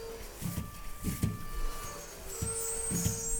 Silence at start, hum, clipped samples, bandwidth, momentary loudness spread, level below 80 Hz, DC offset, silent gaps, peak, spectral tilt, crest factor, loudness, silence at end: 0 s; none; under 0.1%; over 20 kHz; 11 LU; -42 dBFS; under 0.1%; none; -18 dBFS; -4 dB/octave; 18 dB; -36 LUFS; 0 s